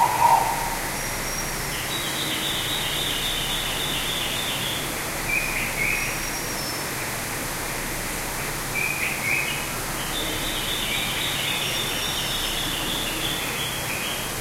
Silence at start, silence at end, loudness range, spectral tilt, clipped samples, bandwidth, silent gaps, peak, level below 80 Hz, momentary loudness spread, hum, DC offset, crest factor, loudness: 0 s; 0 s; 2 LU; -2 dB/octave; under 0.1%; 16 kHz; none; -6 dBFS; -40 dBFS; 5 LU; none; under 0.1%; 20 dB; -24 LUFS